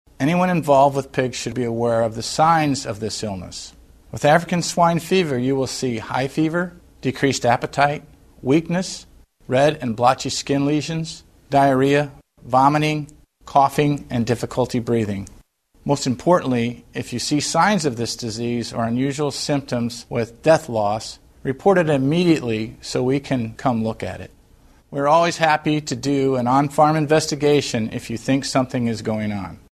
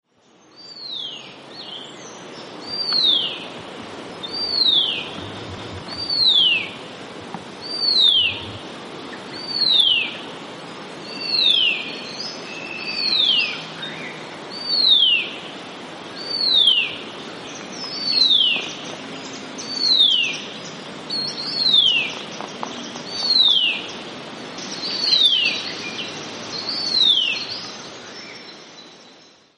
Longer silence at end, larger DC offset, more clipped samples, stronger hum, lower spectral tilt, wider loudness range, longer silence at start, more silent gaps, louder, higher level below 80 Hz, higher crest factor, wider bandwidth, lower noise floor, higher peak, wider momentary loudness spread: second, 0.2 s vs 0.45 s; neither; neither; neither; first, -5.5 dB/octave vs -1.5 dB/octave; about the same, 3 LU vs 4 LU; second, 0.2 s vs 0.55 s; neither; second, -20 LUFS vs -17 LUFS; first, -50 dBFS vs -64 dBFS; about the same, 20 dB vs 16 dB; first, 13.5 kHz vs 11.5 kHz; about the same, -52 dBFS vs -54 dBFS; first, 0 dBFS vs -6 dBFS; second, 11 LU vs 21 LU